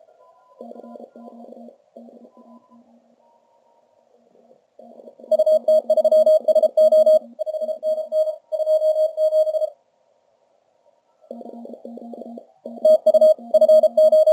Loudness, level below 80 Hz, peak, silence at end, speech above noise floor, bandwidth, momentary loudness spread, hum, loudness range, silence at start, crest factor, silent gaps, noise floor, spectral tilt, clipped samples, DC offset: -17 LUFS; -86 dBFS; -6 dBFS; 0 s; 45 dB; 13 kHz; 24 LU; none; 10 LU; 0.6 s; 14 dB; none; -63 dBFS; -4.5 dB/octave; under 0.1%; under 0.1%